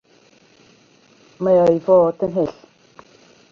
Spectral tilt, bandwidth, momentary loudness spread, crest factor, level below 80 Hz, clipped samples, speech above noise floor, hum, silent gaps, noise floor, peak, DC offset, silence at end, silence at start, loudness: -8.5 dB/octave; 7 kHz; 10 LU; 16 dB; -58 dBFS; under 0.1%; 38 dB; none; none; -53 dBFS; -4 dBFS; under 0.1%; 1 s; 1.4 s; -17 LUFS